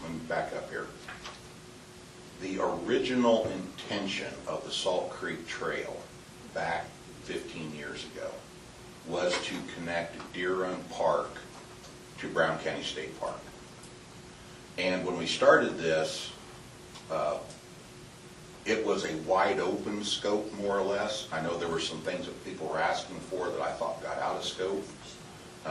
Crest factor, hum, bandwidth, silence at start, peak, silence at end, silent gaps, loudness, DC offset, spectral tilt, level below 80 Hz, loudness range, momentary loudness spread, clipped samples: 24 dB; none; 12.5 kHz; 0 s; -8 dBFS; 0 s; none; -32 LUFS; under 0.1%; -4 dB/octave; -62 dBFS; 6 LU; 19 LU; under 0.1%